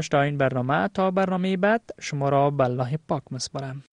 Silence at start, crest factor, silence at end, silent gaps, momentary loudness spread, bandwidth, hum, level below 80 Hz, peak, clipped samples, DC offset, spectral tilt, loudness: 0 s; 16 dB; 0.1 s; none; 9 LU; 10.5 kHz; none; -58 dBFS; -8 dBFS; under 0.1%; under 0.1%; -6 dB/octave; -24 LUFS